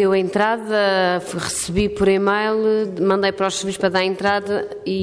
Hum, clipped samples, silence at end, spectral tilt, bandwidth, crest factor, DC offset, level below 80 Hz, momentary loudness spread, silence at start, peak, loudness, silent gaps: none; under 0.1%; 0 s; -4.5 dB/octave; 11 kHz; 14 dB; under 0.1%; -44 dBFS; 6 LU; 0 s; -6 dBFS; -19 LUFS; none